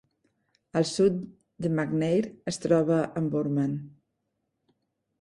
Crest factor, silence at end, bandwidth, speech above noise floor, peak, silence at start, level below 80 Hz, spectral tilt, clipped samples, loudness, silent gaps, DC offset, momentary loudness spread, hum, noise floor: 20 dB; 1.3 s; 11.5 kHz; 53 dB; -10 dBFS; 0.75 s; -64 dBFS; -6.5 dB/octave; under 0.1%; -27 LUFS; none; under 0.1%; 10 LU; none; -79 dBFS